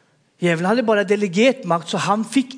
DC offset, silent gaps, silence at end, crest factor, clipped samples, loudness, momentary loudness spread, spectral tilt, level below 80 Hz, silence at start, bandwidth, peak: under 0.1%; none; 0 s; 16 dB; under 0.1%; -19 LUFS; 5 LU; -5 dB/octave; -76 dBFS; 0.4 s; 10.5 kHz; -2 dBFS